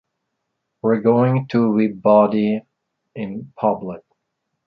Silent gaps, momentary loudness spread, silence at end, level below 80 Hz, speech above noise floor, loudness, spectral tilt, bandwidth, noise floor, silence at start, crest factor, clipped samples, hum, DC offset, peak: none; 16 LU; 0.7 s; -62 dBFS; 59 dB; -18 LUFS; -10.5 dB/octave; 5 kHz; -76 dBFS; 0.85 s; 18 dB; under 0.1%; none; under 0.1%; -2 dBFS